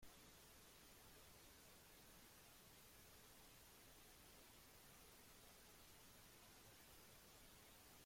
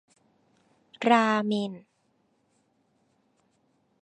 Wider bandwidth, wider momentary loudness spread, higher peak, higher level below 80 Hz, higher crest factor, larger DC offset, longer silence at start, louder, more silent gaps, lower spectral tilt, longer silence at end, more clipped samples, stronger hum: first, 16.5 kHz vs 9.6 kHz; second, 0 LU vs 15 LU; second, -52 dBFS vs -6 dBFS; about the same, -76 dBFS vs -80 dBFS; second, 14 dB vs 24 dB; neither; second, 0 s vs 1 s; second, -65 LUFS vs -25 LUFS; neither; second, -2.5 dB/octave vs -5.5 dB/octave; second, 0 s vs 2.25 s; neither; neither